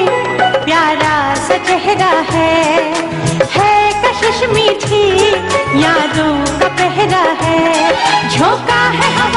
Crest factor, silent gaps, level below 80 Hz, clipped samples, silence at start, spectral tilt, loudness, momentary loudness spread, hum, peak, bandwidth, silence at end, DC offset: 12 dB; none; -38 dBFS; under 0.1%; 0 s; -4 dB/octave; -11 LUFS; 3 LU; none; 0 dBFS; 11.5 kHz; 0 s; under 0.1%